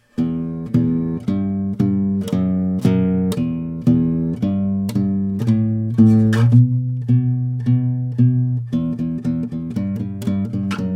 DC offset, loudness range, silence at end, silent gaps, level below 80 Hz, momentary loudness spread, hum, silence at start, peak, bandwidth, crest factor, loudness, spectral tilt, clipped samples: under 0.1%; 3 LU; 0 s; none; -46 dBFS; 9 LU; none; 0.2 s; -2 dBFS; 10 kHz; 16 dB; -19 LUFS; -9 dB/octave; under 0.1%